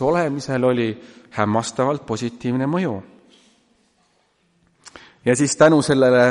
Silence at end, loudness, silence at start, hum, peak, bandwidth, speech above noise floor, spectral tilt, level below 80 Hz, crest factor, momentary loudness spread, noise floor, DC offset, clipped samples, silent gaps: 0 s; -19 LUFS; 0 s; none; -2 dBFS; 11.5 kHz; 45 dB; -5.5 dB/octave; -56 dBFS; 18 dB; 12 LU; -63 dBFS; under 0.1%; under 0.1%; none